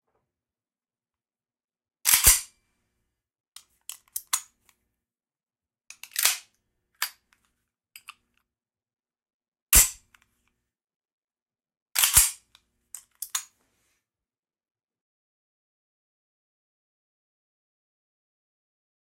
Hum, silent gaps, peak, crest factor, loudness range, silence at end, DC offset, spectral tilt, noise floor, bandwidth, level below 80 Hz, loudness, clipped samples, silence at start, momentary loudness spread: none; 3.40-3.52 s, 9.34-9.40 s, 9.48-9.52 s, 9.62-9.66 s, 10.96-11.00 s, 11.13-11.28 s, 11.42-11.46 s, 11.82-11.86 s; -2 dBFS; 30 dB; 16 LU; 5.6 s; under 0.1%; 1 dB/octave; under -90 dBFS; 16 kHz; -46 dBFS; -22 LUFS; under 0.1%; 2.05 s; 19 LU